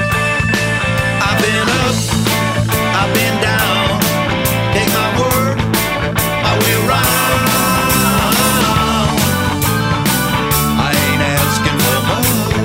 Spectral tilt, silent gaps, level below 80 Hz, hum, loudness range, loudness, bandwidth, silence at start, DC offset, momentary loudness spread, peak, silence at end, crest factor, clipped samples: -4 dB/octave; none; -30 dBFS; none; 1 LU; -13 LUFS; 16.5 kHz; 0 s; under 0.1%; 3 LU; 0 dBFS; 0 s; 14 dB; under 0.1%